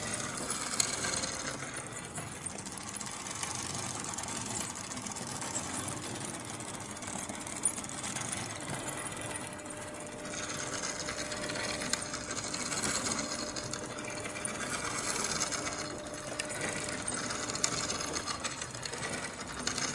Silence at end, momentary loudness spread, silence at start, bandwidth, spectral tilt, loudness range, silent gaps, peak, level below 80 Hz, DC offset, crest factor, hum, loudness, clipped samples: 0 s; 8 LU; 0 s; 12 kHz; -2 dB/octave; 3 LU; none; -6 dBFS; -60 dBFS; under 0.1%; 32 dB; none; -35 LUFS; under 0.1%